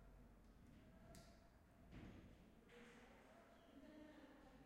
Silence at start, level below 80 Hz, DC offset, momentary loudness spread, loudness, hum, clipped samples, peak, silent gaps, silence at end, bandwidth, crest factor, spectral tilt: 0 s; -72 dBFS; under 0.1%; 6 LU; -66 LUFS; none; under 0.1%; -48 dBFS; none; 0 s; 13 kHz; 18 dB; -5.5 dB/octave